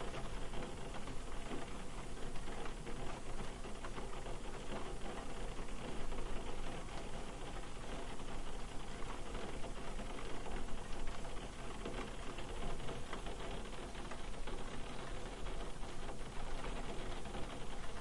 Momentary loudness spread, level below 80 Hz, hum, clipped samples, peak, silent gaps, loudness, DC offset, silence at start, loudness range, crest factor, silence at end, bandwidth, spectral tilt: 2 LU; -46 dBFS; none; under 0.1%; -26 dBFS; none; -48 LUFS; under 0.1%; 0 s; 1 LU; 14 dB; 0 s; 11.5 kHz; -4.5 dB/octave